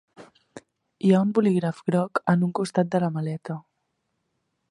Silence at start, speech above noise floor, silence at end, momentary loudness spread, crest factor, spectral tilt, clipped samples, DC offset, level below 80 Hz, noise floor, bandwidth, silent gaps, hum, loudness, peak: 0.2 s; 53 dB; 1.1 s; 11 LU; 22 dB; -8 dB/octave; under 0.1%; under 0.1%; -70 dBFS; -76 dBFS; 11.5 kHz; none; none; -24 LUFS; -4 dBFS